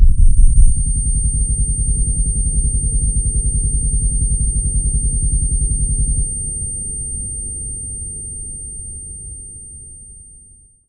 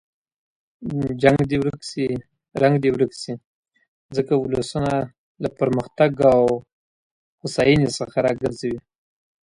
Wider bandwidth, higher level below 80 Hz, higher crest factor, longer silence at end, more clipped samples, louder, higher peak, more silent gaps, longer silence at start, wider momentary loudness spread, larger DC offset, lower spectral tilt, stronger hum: second, 9.4 kHz vs 11.5 kHz; first, -16 dBFS vs -50 dBFS; about the same, 16 dB vs 20 dB; about the same, 0.65 s vs 0.75 s; neither; about the same, -19 LUFS vs -21 LUFS; about the same, 0 dBFS vs -2 dBFS; second, none vs 3.46-3.63 s, 3.88-4.09 s, 5.18-5.35 s, 6.73-7.38 s; second, 0 s vs 0.8 s; about the same, 13 LU vs 15 LU; neither; first, -8.5 dB/octave vs -6.5 dB/octave; neither